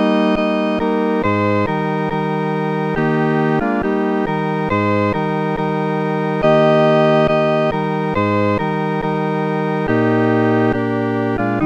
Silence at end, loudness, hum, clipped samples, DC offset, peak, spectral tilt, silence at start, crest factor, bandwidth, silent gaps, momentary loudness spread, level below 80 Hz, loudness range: 0 s; -17 LUFS; none; under 0.1%; under 0.1%; -2 dBFS; -8.5 dB/octave; 0 s; 14 dB; 8.4 kHz; none; 6 LU; -44 dBFS; 2 LU